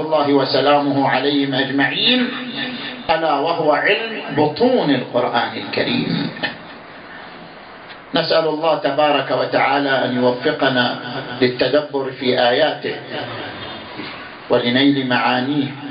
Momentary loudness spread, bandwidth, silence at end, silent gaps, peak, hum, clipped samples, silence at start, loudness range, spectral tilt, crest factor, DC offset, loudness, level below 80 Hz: 15 LU; 5.4 kHz; 0 s; none; -2 dBFS; none; under 0.1%; 0 s; 4 LU; -10.5 dB/octave; 16 dB; under 0.1%; -17 LUFS; -58 dBFS